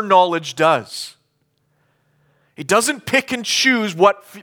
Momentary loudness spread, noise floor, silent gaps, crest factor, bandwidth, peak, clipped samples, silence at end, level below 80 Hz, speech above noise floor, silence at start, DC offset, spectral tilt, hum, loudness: 15 LU; -66 dBFS; none; 18 dB; over 20 kHz; -2 dBFS; under 0.1%; 0 s; -64 dBFS; 49 dB; 0 s; under 0.1%; -3 dB/octave; none; -16 LUFS